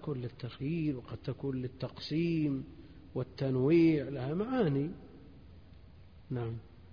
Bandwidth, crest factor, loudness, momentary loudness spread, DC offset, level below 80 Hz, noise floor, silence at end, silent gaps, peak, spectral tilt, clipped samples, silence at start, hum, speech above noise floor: 5.2 kHz; 16 dB; -34 LUFS; 15 LU; under 0.1%; -60 dBFS; -56 dBFS; 0 s; none; -18 dBFS; -7.5 dB/octave; under 0.1%; 0 s; none; 23 dB